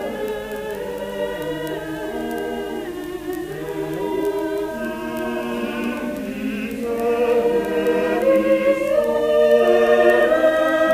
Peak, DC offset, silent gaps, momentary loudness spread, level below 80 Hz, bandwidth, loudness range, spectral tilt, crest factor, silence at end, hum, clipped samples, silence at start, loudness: -2 dBFS; under 0.1%; none; 13 LU; -48 dBFS; 15.5 kHz; 10 LU; -5.5 dB/octave; 18 dB; 0 s; none; under 0.1%; 0 s; -20 LUFS